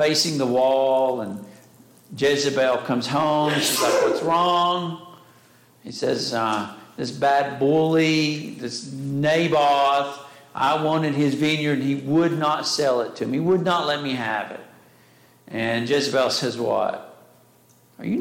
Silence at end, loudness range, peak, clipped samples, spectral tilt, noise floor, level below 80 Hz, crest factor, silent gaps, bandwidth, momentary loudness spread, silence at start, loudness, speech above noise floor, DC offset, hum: 0 s; 4 LU; -10 dBFS; under 0.1%; -4.5 dB/octave; -56 dBFS; -66 dBFS; 12 dB; none; 17 kHz; 13 LU; 0 s; -21 LUFS; 34 dB; under 0.1%; none